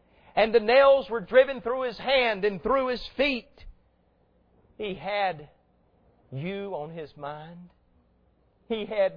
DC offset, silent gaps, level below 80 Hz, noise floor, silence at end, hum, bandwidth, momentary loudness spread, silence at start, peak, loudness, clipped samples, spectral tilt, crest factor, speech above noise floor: under 0.1%; none; -54 dBFS; -66 dBFS; 0 s; none; 5.2 kHz; 19 LU; 0.35 s; -8 dBFS; -25 LUFS; under 0.1%; -7 dB/octave; 20 dB; 40 dB